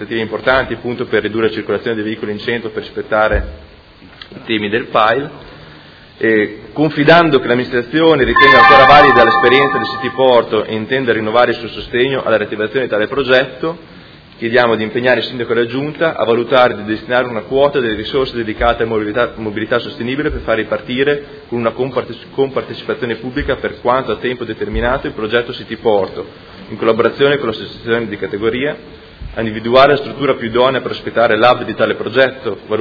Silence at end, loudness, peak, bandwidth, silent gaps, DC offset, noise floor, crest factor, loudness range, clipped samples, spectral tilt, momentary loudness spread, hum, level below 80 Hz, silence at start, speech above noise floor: 0 s; -14 LUFS; 0 dBFS; 5.4 kHz; none; under 0.1%; -39 dBFS; 14 dB; 10 LU; 0.3%; -7 dB/octave; 12 LU; none; -36 dBFS; 0 s; 25 dB